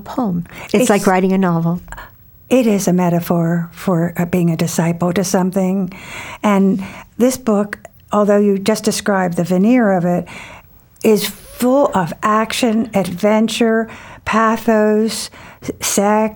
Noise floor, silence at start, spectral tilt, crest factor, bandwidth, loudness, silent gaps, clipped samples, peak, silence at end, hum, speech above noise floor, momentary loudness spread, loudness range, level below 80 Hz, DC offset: -39 dBFS; 0 s; -5.5 dB/octave; 14 dB; over 20 kHz; -16 LUFS; none; under 0.1%; -2 dBFS; 0 s; none; 24 dB; 12 LU; 2 LU; -48 dBFS; under 0.1%